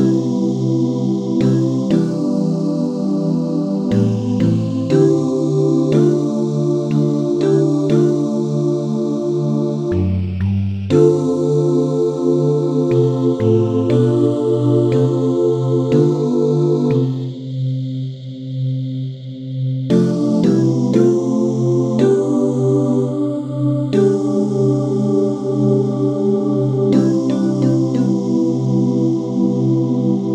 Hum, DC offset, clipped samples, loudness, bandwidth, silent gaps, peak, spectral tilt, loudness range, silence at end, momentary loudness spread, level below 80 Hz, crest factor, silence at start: none; under 0.1%; under 0.1%; -16 LUFS; 9.2 kHz; none; 0 dBFS; -9 dB/octave; 2 LU; 0 s; 5 LU; -54 dBFS; 16 dB; 0 s